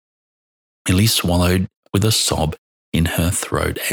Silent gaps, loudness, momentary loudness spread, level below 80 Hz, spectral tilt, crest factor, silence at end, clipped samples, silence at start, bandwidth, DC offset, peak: 1.76-1.83 s, 2.58-2.92 s; -18 LUFS; 9 LU; -34 dBFS; -4 dB/octave; 18 dB; 0 s; under 0.1%; 0.85 s; over 20 kHz; under 0.1%; -2 dBFS